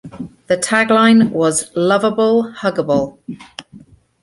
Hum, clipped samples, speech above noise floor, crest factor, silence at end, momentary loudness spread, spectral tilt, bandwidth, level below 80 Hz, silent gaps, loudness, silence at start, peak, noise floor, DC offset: none; under 0.1%; 29 dB; 14 dB; 0.45 s; 22 LU; -4.5 dB/octave; 11.5 kHz; -54 dBFS; none; -14 LUFS; 0.05 s; -2 dBFS; -43 dBFS; under 0.1%